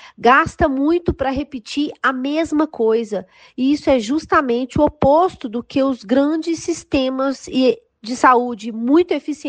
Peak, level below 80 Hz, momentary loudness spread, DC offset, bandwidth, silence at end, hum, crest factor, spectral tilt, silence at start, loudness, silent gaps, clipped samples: 0 dBFS; -42 dBFS; 10 LU; under 0.1%; 9.4 kHz; 0 s; none; 18 dB; -5.5 dB/octave; 0.05 s; -18 LUFS; none; under 0.1%